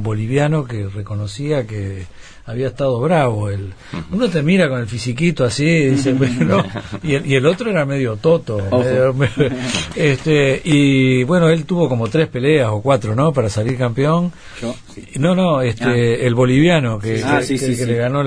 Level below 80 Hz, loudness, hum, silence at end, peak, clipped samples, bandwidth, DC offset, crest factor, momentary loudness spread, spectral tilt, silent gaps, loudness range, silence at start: -42 dBFS; -16 LUFS; none; 0 s; -2 dBFS; under 0.1%; 11 kHz; 0.3%; 14 dB; 11 LU; -6.5 dB/octave; none; 5 LU; 0 s